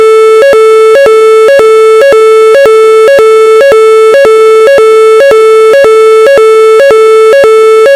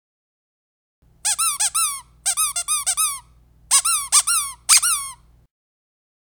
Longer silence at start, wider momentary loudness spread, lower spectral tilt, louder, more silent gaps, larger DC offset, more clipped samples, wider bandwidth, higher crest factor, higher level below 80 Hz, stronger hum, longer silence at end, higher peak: second, 0 s vs 1.25 s; second, 0 LU vs 9 LU; first, -2 dB/octave vs 4 dB/octave; first, -2 LUFS vs -18 LUFS; neither; neither; first, 6% vs under 0.1%; second, 13 kHz vs over 20 kHz; second, 2 dB vs 22 dB; first, -44 dBFS vs -56 dBFS; second, none vs 60 Hz at -65 dBFS; second, 0 s vs 1.15 s; about the same, 0 dBFS vs 0 dBFS